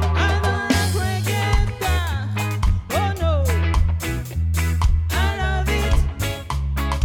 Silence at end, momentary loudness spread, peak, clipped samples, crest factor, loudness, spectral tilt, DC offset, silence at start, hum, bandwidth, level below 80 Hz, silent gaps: 0 s; 5 LU; -4 dBFS; under 0.1%; 16 dB; -21 LUFS; -5 dB/octave; under 0.1%; 0 s; none; 17.5 kHz; -24 dBFS; none